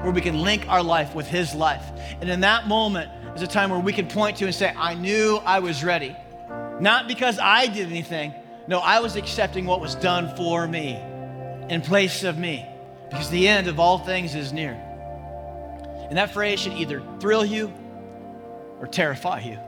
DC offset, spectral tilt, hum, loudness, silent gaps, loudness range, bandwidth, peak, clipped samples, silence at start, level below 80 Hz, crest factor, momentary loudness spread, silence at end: under 0.1%; -4.5 dB/octave; none; -22 LUFS; none; 5 LU; 18 kHz; -2 dBFS; under 0.1%; 0 s; -44 dBFS; 22 dB; 17 LU; 0 s